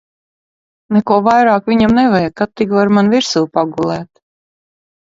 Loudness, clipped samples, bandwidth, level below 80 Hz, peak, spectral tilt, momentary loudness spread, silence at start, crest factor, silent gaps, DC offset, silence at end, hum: -13 LUFS; under 0.1%; 7.8 kHz; -46 dBFS; 0 dBFS; -6 dB/octave; 8 LU; 0.9 s; 14 dB; none; under 0.1%; 1 s; none